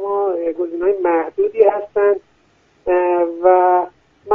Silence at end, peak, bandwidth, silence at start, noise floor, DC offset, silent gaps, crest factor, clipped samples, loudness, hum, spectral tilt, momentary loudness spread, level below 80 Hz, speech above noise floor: 0 s; 0 dBFS; 3.4 kHz; 0 s; -56 dBFS; under 0.1%; none; 16 dB; under 0.1%; -16 LUFS; none; -8 dB/octave; 8 LU; -54 dBFS; 41 dB